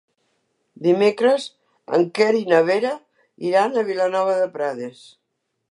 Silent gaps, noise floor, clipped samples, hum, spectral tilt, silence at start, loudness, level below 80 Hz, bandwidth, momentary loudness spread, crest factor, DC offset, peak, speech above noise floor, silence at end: none; -75 dBFS; under 0.1%; none; -5.5 dB/octave; 0.8 s; -20 LUFS; -80 dBFS; 11 kHz; 12 LU; 18 dB; under 0.1%; -4 dBFS; 56 dB; 0.8 s